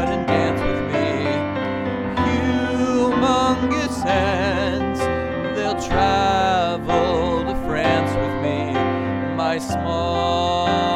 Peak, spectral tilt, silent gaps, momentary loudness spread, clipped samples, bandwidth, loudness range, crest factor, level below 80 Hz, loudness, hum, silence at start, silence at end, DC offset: -4 dBFS; -5.5 dB/octave; none; 5 LU; under 0.1%; 13.5 kHz; 1 LU; 14 dB; -36 dBFS; -20 LUFS; none; 0 s; 0 s; under 0.1%